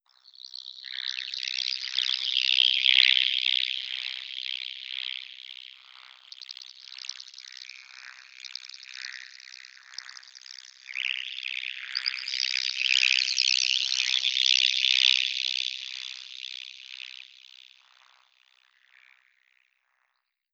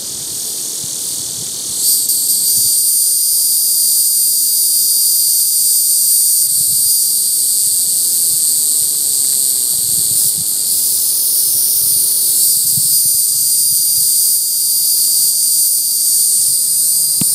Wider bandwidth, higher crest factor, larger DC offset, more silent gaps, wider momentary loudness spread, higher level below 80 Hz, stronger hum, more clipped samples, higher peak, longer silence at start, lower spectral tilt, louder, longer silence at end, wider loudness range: second, 12.5 kHz vs over 20 kHz; first, 28 dB vs 14 dB; neither; neither; first, 24 LU vs 3 LU; second, under -90 dBFS vs -60 dBFS; neither; neither; about the same, -2 dBFS vs 0 dBFS; first, 0.65 s vs 0 s; second, 8.5 dB/octave vs 1.5 dB/octave; second, -24 LUFS vs -10 LUFS; first, 3.3 s vs 0 s; first, 20 LU vs 2 LU